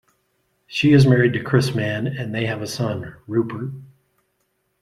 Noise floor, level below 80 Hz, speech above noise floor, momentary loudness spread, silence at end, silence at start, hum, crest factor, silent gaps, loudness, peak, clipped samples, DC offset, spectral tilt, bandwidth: -70 dBFS; -54 dBFS; 51 dB; 16 LU; 0.95 s; 0.7 s; none; 18 dB; none; -20 LUFS; -2 dBFS; under 0.1%; under 0.1%; -6.5 dB/octave; 13 kHz